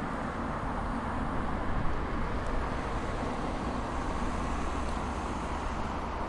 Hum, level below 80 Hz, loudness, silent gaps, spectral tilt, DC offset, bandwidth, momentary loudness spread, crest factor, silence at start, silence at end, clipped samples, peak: none; -38 dBFS; -34 LUFS; none; -6 dB/octave; under 0.1%; 11.5 kHz; 1 LU; 14 dB; 0 s; 0 s; under 0.1%; -18 dBFS